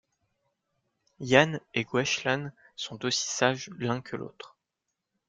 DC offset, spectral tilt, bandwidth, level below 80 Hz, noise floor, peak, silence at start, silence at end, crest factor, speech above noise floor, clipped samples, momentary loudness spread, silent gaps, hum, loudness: under 0.1%; -3.5 dB/octave; 9.6 kHz; -70 dBFS; -84 dBFS; -4 dBFS; 1.2 s; 0.8 s; 26 dB; 56 dB; under 0.1%; 18 LU; none; none; -27 LUFS